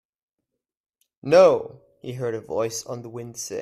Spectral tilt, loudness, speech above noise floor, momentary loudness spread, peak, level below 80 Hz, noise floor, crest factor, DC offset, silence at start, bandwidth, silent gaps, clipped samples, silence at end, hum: -4.5 dB/octave; -21 LUFS; 61 dB; 22 LU; -4 dBFS; -66 dBFS; -83 dBFS; 20 dB; under 0.1%; 1.25 s; 14 kHz; none; under 0.1%; 0 s; none